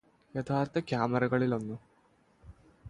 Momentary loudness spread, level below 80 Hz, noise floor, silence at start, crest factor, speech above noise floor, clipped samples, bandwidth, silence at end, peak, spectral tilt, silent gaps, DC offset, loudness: 13 LU; -62 dBFS; -67 dBFS; 0.35 s; 20 dB; 36 dB; under 0.1%; 10.5 kHz; 0 s; -14 dBFS; -8 dB/octave; none; under 0.1%; -32 LUFS